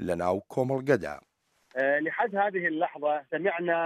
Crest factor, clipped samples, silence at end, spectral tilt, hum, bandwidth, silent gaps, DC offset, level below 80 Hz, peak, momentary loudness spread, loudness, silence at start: 18 dB; under 0.1%; 0 s; -7 dB/octave; none; 14 kHz; none; under 0.1%; -64 dBFS; -10 dBFS; 4 LU; -28 LUFS; 0 s